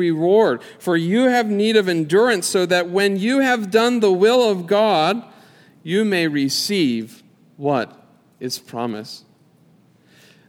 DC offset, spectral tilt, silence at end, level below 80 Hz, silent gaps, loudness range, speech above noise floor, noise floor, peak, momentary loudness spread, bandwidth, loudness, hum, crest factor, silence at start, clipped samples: under 0.1%; -4.5 dB/octave; 1.3 s; -72 dBFS; none; 8 LU; 36 dB; -54 dBFS; -2 dBFS; 12 LU; 17 kHz; -18 LUFS; none; 18 dB; 0 s; under 0.1%